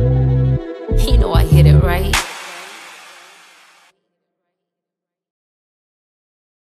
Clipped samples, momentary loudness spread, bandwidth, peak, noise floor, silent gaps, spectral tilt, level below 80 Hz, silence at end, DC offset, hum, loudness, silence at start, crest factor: under 0.1%; 22 LU; 14.5 kHz; 0 dBFS; -85 dBFS; none; -6 dB/octave; -22 dBFS; 3.75 s; under 0.1%; none; -15 LUFS; 0 s; 16 dB